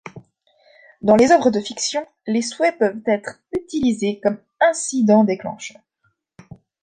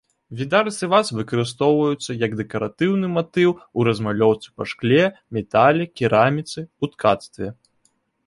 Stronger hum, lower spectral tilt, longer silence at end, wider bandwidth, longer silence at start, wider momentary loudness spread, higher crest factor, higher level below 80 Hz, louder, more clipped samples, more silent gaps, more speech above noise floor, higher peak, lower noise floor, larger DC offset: neither; second, -4.5 dB/octave vs -6 dB/octave; first, 1.15 s vs 0.75 s; second, 9.8 kHz vs 11.5 kHz; second, 0.05 s vs 0.3 s; about the same, 14 LU vs 12 LU; about the same, 18 dB vs 18 dB; about the same, -56 dBFS vs -56 dBFS; about the same, -19 LUFS vs -20 LUFS; neither; neither; about the same, 49 dB vs 46 dB; about the same, -2 dBFS vs -2 dBFS; about the same, -68 dBFS vs -66 dBFS; neither